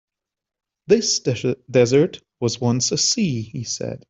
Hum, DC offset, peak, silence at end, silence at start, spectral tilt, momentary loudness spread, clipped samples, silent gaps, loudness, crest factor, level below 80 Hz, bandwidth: none; under 0.1%; -2 dBFS; 0.15 s; 0.9 s; -4 dB/octave; 10 LU; under 0.1%; none; -20 LUFS; 18 dB; -58 dBFS; 8.2 kHz